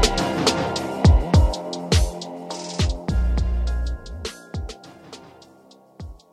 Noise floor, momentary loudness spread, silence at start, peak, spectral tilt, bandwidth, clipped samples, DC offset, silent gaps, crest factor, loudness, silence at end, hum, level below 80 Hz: -51 dBFS; 23 LU; 0 s; -2 dBFS; -5 dB/octave; 13.5 kHz; under 0.1%; under 0.1%; none; 20 dB; -23 LUFS; 0.15 s; none; -26 dBFS